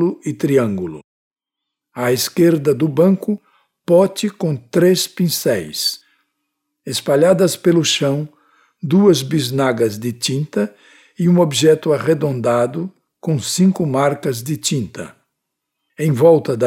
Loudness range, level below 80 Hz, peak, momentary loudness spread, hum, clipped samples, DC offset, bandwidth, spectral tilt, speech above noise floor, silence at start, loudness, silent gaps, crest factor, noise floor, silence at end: 3 LU; -60 dBFS; -2 dBFS; 12 LU; none; under 0.1%; under 0.1%; 17.5 kHz; -5.5 dB/octave; 66 dB; 0 s; -16 LUFS; 1.04-1.31 s; 16 dB; -81 dBFS; 0 s